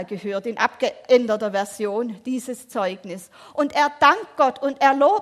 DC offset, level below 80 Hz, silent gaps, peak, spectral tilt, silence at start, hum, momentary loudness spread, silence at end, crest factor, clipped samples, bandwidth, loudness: under 0.1%; -68 dBFS; none; -2 dBFS; -4 dB/octave; 0 s; none; 12 LU; 0 s; 18 dB; under 0.1%; 14.5 kHz; -21 LUFS